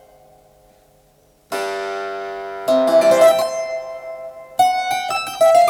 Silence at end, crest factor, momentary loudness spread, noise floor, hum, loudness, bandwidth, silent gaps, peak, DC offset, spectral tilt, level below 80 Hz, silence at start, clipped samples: 0 s; 16 dB; 16 LU; -55 dBFS; none; -18 LUFS; 18 kHz; none; -2 dBFS; under 0.1%; -2.5 dB/octave; -60 dBFS; 1.5 s; under 0.1%